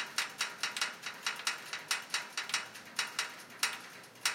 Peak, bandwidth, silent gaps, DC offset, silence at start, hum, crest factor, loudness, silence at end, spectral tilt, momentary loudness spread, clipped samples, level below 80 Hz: -14 dBFS; 17 kHz; none; under 0.1%; 0 s; none; 24 dB; -36 LUFS; 0 s; 1.5 dB/octave; 5 LU; under 0.1%; under -90 dBFS